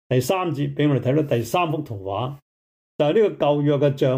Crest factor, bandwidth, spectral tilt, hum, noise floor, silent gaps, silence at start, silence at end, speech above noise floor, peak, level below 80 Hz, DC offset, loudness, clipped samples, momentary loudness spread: 14 dB; 16 kHz; -7 dB/octave; none; under -90 dBFS; 2.42-2.99 s; 0.1 s; 0 s; over 70 dB; -8 dBFS; -60 dBFS; under 0.1%; -22 LUFS; under 0.1%; 9 LU